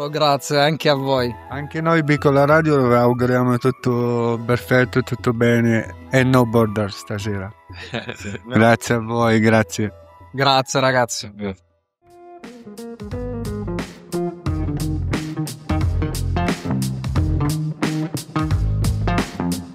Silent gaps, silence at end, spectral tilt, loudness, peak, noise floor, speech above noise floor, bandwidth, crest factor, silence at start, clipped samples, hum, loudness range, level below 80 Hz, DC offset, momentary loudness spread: none; 0 s; -6 dB/octave; -19 LUFS; 0 dBFS; -54 dBFS; 37 dB; 16 kHz; 18 dB; 0 s; under 0.1%; none; 9 LU; -36 dBFS; under 0.1%; 14 LU